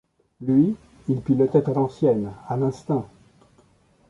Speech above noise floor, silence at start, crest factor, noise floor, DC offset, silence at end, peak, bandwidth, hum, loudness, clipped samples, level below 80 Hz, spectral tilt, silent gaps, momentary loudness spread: 37 dB; 0.4 s; 18 dB; -59 dBFS; under 0.1%; 1.05 s; -6 dBFS; 7.6 kHz; none; -23 LUFS; under 0.1%; -56 dBFS; -10 dB/octave; none; 10 LU